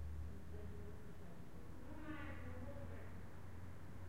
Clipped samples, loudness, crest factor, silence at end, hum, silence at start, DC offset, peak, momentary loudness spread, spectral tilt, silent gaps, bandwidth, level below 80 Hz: under 0.1%; -54 LUFS; 14 dB; 0 s; none; 0 s; 0.3%; -38 dBFS; 6 LU; -7 dB/octave; none; 16 kHz; -60 dBFS